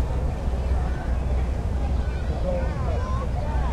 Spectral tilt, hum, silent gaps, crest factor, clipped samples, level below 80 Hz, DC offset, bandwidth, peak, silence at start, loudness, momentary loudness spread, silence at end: -8 dB/octave; none; none; 10 dB; under 0.1%; -26 dBFS; under 0.1%; 9 kHz; -12 dBFS; 0 s; -27 LUFS; 1 LU; 0 s